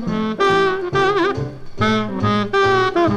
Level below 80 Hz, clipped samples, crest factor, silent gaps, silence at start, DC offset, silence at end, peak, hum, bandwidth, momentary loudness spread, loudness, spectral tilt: -42 dBFS; under 0.1%; 12 dB; none; 0 s; under 0.1%; 0 s; -4 dBFS; none; 9.8 kHz; 6 LU; -18 LUFS; -6 dB/octave